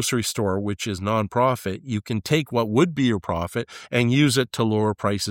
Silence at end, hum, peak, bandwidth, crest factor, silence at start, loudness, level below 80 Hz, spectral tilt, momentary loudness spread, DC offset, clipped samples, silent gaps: 0 s; none; -6 dBFS; 17 kHz; 18 dB; 0 s; -23 LUFS; -52 dBFS; -5 dB/octave; 8 LU; under 0.1%; under 0.1%; none